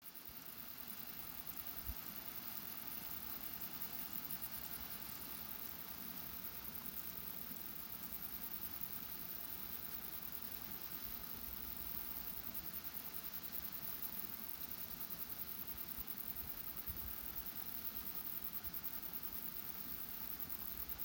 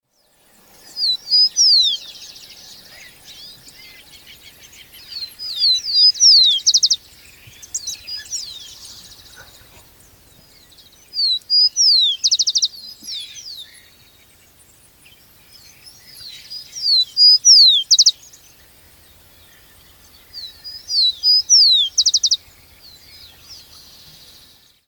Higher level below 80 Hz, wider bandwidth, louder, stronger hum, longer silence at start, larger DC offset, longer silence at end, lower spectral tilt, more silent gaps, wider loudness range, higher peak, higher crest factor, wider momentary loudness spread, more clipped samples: about the same, -64 dBFS vs -60 dBFS; second, 17 kHz vs over 20 kHz; second, -44 LUFS vs -12 LUFS; neither; second, 0 s vs 0.95 s; neither; second, 0 s vs 1.35 s; first, -2.5 dB/octave vs 3.5 dB/octave; neither; second, 2 LU vs 19 LU; second, -28 dBFS vs -2 dBFS; about the same, 20 dB vs 18 dB; second, 3 LU vs 25 LU; neither